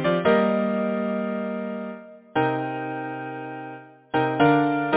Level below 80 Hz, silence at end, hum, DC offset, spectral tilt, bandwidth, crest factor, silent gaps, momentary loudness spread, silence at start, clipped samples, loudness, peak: -62 dBFS; 0 s; none; under 0.1%; -10.5 dB/octave; 4 kHz; 20 dB; none; 16 LU; 0 s; under 0.1%; -24 LUFS; -4 dBFS